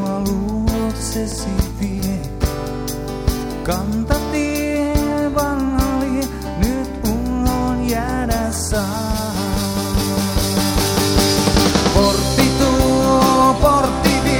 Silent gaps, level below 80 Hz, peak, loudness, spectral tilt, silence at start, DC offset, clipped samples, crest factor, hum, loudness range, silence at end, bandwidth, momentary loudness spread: none; -26 dBFS; 0 dBFS; -18 LUFS; -5 dB/octave; 0 s; under 0.1%; under 0.1%; 16 dB; none; 7 LU; 0 s; over 20 kHz; 8 LU